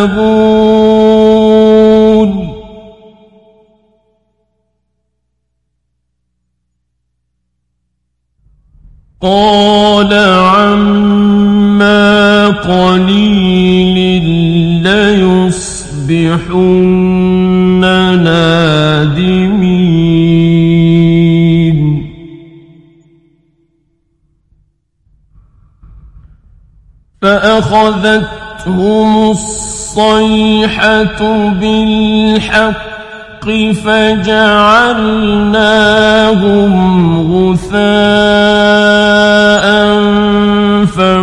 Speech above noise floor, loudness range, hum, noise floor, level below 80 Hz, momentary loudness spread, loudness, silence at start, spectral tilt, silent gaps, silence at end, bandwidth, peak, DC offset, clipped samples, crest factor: 58 dB; 6 LU; 60 Hz at -40 dBFS; -66 dBFS; -32 dBFS; 6 LU; -8 LUFS; 0 s; -6 dB/octave; none; 0 s; 11 kHz; 0 dBFS; under 0.1%; 0.1%; 10 dB